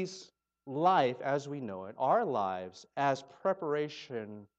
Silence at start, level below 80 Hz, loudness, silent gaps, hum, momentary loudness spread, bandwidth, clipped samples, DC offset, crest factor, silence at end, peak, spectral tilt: 0 s; -84 dBFS; -33 LUFS; none; none; 14 LU; 8.2 kHz; under 0.1%; under 0.1%; 18 dB; 0.15 s; -14 dBFS; -5.5 dB/octave